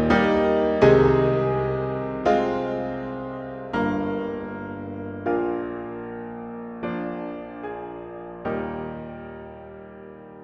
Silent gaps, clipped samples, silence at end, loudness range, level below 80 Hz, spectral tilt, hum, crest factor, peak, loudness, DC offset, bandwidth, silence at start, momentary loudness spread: none; under 0.1%; 0 s; 11 LU; -46 dBFS; -8 dB/octave; none; 20 dB; -4 dBFS; -25 LUFS; under 0.1%; 7 kHz; 0 s; 18 LU